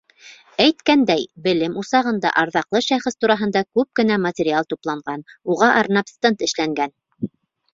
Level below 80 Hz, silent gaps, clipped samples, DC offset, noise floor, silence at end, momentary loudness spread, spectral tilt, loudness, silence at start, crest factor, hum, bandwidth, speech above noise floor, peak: -62 dBFS; none; under 0.1%; under 0.1%; -47 dBFS; 0.45 s; 12 LU; -4.5 dB/octave; -19 LUFS; 0.25 s; 20 dB; none; 7.8 kHz; 28 dB; 0 dBFS